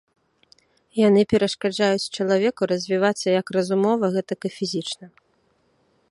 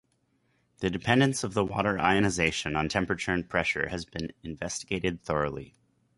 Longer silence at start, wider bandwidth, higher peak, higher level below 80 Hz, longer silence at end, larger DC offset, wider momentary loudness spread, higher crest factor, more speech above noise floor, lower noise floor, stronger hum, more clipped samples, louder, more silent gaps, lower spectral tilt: first, 0.95 s vs 0.8 s; about the same, 11.5 kHz vs 11.5 kHz; about the same, -6 dBFS vs -8 dBFS; second, -62 dBFS vs -50 dBFS; first, 1.05 s vs 0.5 s; neither; about the same, 10 LU vs 11 LU; about the same, 18 dB vs 22 dB; about the same, 44 dB vs 43 dB; second, -65 dBFS vs -71 dBFS; neither; neither; first, -22 LUFS vs -28 LUFS; neither; about the same, -5 dB/octave vs -4.5 dB/octave